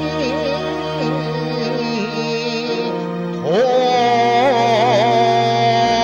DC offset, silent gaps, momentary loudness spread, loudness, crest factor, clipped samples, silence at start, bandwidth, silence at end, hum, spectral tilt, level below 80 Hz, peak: under 0.1%; none; 8 LU; -17 LUFS; 12 dB; under 0.1%; 0 s; 9.6 kHz; 0 s; none; -5.5 dB/octave; -50 dBFS; -4 dBFS